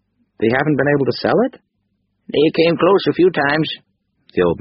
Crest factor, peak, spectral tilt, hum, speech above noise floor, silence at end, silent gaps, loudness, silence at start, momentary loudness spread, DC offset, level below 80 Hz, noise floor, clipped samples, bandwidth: 16 dB; -2 dBFS; -4.5 dB/octave; none; 53 dB; 0 s; none; -16 LUFS; 0.4 s; 8 LU; under 0.1%; -52 dBFS; -68 dBFS; under 0.1%; 5.8 kHz